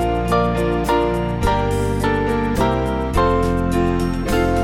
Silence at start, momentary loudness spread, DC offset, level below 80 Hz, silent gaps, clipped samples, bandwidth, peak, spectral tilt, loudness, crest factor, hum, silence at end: 0 s; 2 LU; under 0.1%; -26 dBFS; none; under 0.1%; 16.5 kHz; -2 dBFS; -6.5 dB/octave; -19 LUFS; 14 dB; none; 0 s